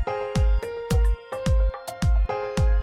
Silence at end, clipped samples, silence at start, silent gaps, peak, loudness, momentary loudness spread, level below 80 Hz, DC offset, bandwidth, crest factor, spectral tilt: 0 s; under 0.1%; 0 s; none; -12 dBFS; -25 LUFS; 4 LU; -24 dBFS; under 0.1%; 12 kHz; 10 dB; -6.5 dB/octave